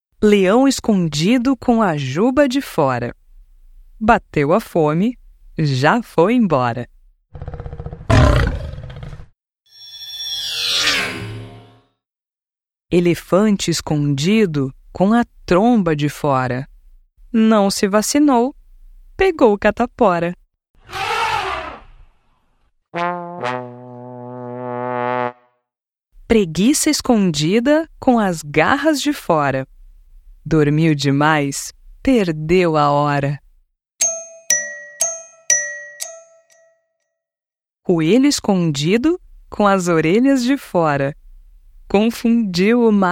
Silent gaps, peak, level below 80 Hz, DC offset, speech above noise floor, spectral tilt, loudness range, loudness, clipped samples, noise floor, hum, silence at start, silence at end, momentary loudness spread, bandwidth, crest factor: 20.70-20.74 s; 0 dBFS; -36 dBFS; under 0.1%; over 75 dB; -5 dB/octave; 6 LU; -17 LUFS; under 0.1%; under -90 dBFS; none; 0.2 s; 0 s; 16 LU; 16.5 kHz; 18 dB